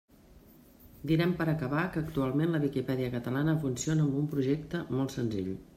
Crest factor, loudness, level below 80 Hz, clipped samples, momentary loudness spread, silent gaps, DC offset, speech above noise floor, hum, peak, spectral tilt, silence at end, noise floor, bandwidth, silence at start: 14 dB; -31 LUFS; -56 dBFS; under 0.1%; 5 LU; none; under 0.1%; 27 dB; none; -16 dBFS; -6.5 dB/octave; 0.1 s; -57 dBFS; 15.5 kHz; 0.35 s